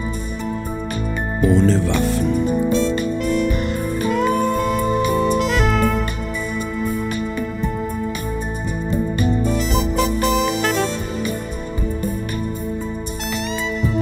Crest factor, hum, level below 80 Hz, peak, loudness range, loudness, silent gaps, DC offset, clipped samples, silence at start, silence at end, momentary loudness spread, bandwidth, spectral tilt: 18 dB; none; -26 dBFS; -2 dBFS; 4 LU; -20 LUFS; none; under 0.1%; under 0.1%; 0 s; 0 s; 9 LU; 16 kHz; -5.5 dB/octave